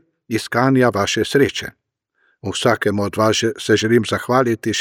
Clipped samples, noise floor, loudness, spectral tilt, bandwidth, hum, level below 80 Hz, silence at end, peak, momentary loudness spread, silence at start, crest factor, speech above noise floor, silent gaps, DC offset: under 0.1%; -65 dBFS; -18 LUFS; -4.5 dB/octave; 17.5 kHz; none; -54 dBFS; 0 s; -2 dBFS; 10 LU; 0.3 s; 16 dB; 48 dB; none; under 0.1%